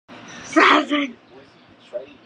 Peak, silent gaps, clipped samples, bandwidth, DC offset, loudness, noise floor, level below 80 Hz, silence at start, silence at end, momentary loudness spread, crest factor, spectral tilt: 0 dBFS; none; under 0.1%; 9.8 kHz; under 0.1%; -17 LUFS; -49 dBFS; -68 dBFS; 0.1 s; 0.2 s; 23 LU; 22 dB; -2.5 dB/octave